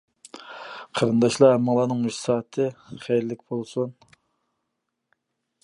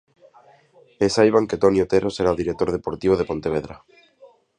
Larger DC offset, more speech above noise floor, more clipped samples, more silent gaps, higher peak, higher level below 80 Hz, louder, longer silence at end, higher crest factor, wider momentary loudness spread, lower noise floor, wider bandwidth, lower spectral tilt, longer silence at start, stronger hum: neither; first, 57 dB vs 34 dB; neither; neither; about the same, -4 dBFS vs -2 dBFS; second, -68 dBFS vs -46 dBFS; about the same, -23 LUFS vs -21 LUFS; first, 1.7 s vs 0.8 s; about the same, 20 dB vs 20 dB; first, 21 LU vs 8 LU; first, -79 dBFS vs -54 dBFS; first, 11.5 kHz vs 10 kHz; about the same, -6 dB/octave vs -6 dB/octave; second, 0.35 s vs 1 s; neither